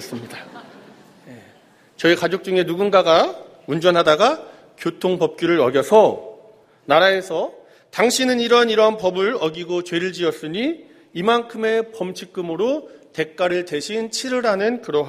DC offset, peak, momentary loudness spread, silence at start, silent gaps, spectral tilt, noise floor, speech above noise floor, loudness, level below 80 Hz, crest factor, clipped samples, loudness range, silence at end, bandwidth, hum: under 0.1%; 0 dBFS; 14 LU; 0 s; none; -4 dB/octave; -52 dBFS; 33 dB; -19 LUFS; -64 dBFS; 20 dB; under 0.1%; 5 LU; 0 s; 15.5 kHz; none